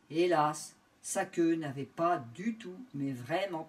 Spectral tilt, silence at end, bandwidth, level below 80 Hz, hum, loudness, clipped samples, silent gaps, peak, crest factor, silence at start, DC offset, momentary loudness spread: -5 dB/octave; 0 s; 15 kHz; -80 dBFS; none; -33 LUFS; under 0.1%; none; -16 dBFS; 18 dB; 0.1 s; under 0.1%; 15 LU